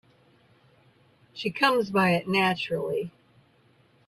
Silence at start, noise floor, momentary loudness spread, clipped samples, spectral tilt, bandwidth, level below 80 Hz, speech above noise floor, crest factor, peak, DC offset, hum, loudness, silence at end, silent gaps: 1.35 s; -62 dBFS; 11 LU; under 0.1%; -5.5 dB/octave; 14.5 kHz; -68 dBFS; 37 dB; 20 dB; -10 dBFS; under 0.1%; none; -25 LUFS; 1 s; none